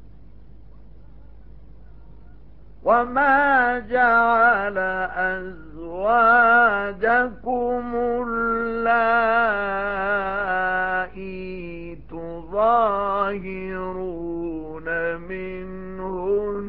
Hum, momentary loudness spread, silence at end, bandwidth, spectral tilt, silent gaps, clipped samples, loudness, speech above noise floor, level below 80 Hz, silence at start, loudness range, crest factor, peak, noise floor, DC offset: none; 17 LU; 0 s; 5.4 kHz; -3.5 dB/octave; none; under 0.1%; -21 LUFS; 27 dB; -46 dBFS; 0 s; 7 LU; 16 dB; -6 dBFS; -47 dBFS; 0.8%